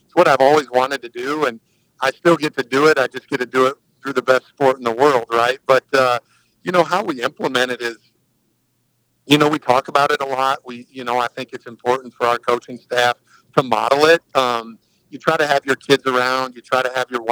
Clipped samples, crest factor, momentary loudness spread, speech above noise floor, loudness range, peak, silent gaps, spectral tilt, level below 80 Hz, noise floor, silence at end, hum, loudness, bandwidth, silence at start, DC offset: under 0.1%; 18 dB; 10 LU; 48 dB; 3 LU; 0 dBFS; none; -4.5 dB/octave; -68 dBFS; -66 dBFS; 0 s; none; -18 LUFS; over 20 kHz; 0.15 s; under 0.1%